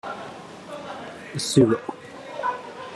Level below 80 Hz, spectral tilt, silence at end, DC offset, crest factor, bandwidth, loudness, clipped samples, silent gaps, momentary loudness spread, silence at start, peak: -62 dBFS; -5 dB/octave; 0 s; under 0.1%; 22 dB; 13 kHz; -24 LUFS; under 0.1%; none; 19 LU; 0.05 s; -4 dBFS